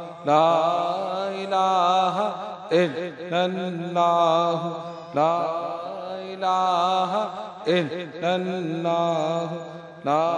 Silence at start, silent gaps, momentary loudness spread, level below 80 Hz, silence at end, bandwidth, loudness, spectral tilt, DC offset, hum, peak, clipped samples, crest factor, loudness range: 0 s; none; 12 LU; -78 dBFS; 0 s; 10.5 kHz; -24 LUFS; -5.5 dB/octave; under 0.1%; none; -4 dBFS; under 0.1%; 18 dB; 3 LU